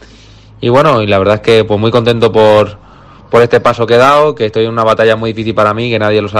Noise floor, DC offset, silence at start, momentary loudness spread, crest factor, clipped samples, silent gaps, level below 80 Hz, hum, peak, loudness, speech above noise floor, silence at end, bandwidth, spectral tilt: -37 dBFS; under 0.1%; 0.6 s; 5 LU; 10 dB; 0.5%; none; -42 dBFS; none; 0 dBFS; -9 LUFS; 28 dB; 0 s; 12.5 kHz; -6.5 dB/octave